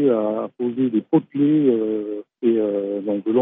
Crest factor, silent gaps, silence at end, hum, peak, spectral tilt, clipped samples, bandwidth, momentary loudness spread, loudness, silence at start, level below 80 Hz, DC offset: 14 dB; none; 0 s; none; -6 dBFS; -12.5 dB/octave; under 0.1%; 3.8 kHz; 7 LU; -21 LUFS; 0 s; -80 dBFS; under 0.1%